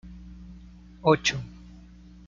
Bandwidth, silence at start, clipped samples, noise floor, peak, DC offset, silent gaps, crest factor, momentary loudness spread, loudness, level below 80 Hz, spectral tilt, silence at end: 7.6 kHz; 0.05 s; under 0.1%; -49 dBFS; -6 dBFS; under 0.1%; none; 24 dB; 26 LU; -25 LUFS; -48 dBFS; -4.5 dB/octave; 0.45 s